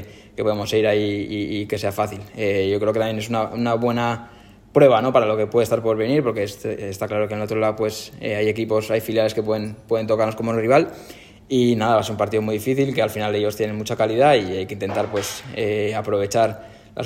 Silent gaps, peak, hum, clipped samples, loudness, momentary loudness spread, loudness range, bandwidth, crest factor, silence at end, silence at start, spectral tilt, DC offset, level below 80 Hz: none; -2 dBFS; none; under 0.1%; -21 LUFS; 9 LU; 3 LU; 16.5 kHz; 20 dB; 0 s; 0 s; -5.5 dB/octave; under 0.1%; -54 dBFS